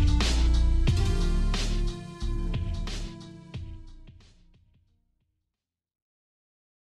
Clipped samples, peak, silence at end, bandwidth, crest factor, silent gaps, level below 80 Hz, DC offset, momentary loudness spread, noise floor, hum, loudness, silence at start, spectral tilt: under 0.1%; -14 dBFS; 2.7 s; 11.5 kHz; 14 dB; none; -28 dBFS; under 0.1%; 17 LU; -88 dBFS; none; -29 LUFS; 0 s; -5.5 dB/octave